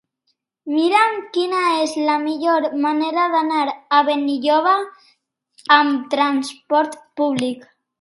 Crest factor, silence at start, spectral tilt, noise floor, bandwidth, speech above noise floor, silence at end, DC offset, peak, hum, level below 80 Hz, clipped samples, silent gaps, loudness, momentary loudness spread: 18 dB; 0.65 s; -3.5 dB/octave; -71 dBFS; 11.5 kHz; 53 dB; 0.4 s; under 0.1%; 0 dBFS; none; -74 dBFS; under 0.1%; none; -18 LUFS; 9 LU